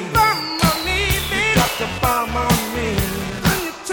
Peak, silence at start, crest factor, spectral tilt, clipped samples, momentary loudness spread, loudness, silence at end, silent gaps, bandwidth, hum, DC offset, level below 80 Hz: -2 dBFS; 0 s; 18 dB; -4 dB/octave; under 0.1%; 5 LU; -18 LUFS; 0 s; none; over 20 kHz; none; under 0.1%; -32 dBFS